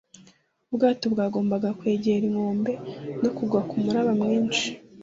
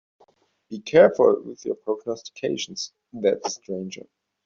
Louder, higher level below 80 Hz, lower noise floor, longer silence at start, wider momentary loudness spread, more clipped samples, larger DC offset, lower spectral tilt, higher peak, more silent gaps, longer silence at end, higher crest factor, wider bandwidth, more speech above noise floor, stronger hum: about the same, -25 LUFS vs -23 LUFS; about the same, -64 dBFS vs -66 dBFS; about the same, -59 dBFS vs -61 dBFS; about the same, 0.7 s vs 0.7 s; second, 6 LU vs 19 LU; neither; neither; first, -5.5 dB/octave vs -4 dB/octave; second, -8 dBFS vs -4 dBFS; neither; second, 0 s vs 0.5 s; about the same, 16 dB vs 20 dB; about the same, 7.8 kHz vs 7.4 kHz; second, 34 dB vs 38 dB; neither